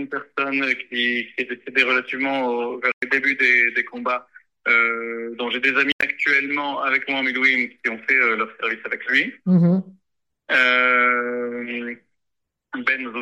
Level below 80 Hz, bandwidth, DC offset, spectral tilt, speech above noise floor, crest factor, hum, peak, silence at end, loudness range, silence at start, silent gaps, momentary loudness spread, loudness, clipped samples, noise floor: -72 dBFS; 9 kHz; under 0.1%; -6 dB/octave; 58 dB; 18 dB; none; -4 dBFS; 0 s; 2 LU; 0 s; 2.94-3.01 s, 5.93-5.99 s; 11 LU; -20 LUFS; under 0.1%; -79 dBFS